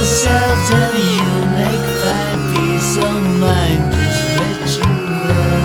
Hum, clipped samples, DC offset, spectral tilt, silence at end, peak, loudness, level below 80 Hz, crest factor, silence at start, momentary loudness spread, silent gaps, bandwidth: none; under 0.1%; under 0.1%; -5 dB/octave; 0 s; 0 dBFS; -15 LUFS; -28 dBFS; 14 dB; 0 s; 3 LU; none; 18.5 kHz